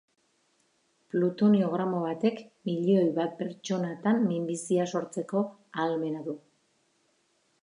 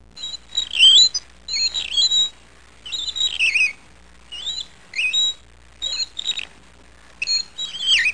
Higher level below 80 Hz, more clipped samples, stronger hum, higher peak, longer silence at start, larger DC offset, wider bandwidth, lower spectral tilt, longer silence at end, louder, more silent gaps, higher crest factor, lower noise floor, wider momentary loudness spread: second, -80 dBFS vs -52 dBFS; neither; neither; second, -12 dBFS vs -4 dBFS; first, 1.15 s vs 0.15 s; second, under 0.1% vs 0.5%; about the same, 11 kHz vs 10.5 kHz; first, -7 dB/octave vs 3 dB/octave; first, 1.25 s vs 0 s; second, -29 LUFS vs -17 LUFS; neither; about the same, 16 dB vs 18 dB; first, -71 dBFS vs -49 dBFS; second, 10 LU vs 17 LU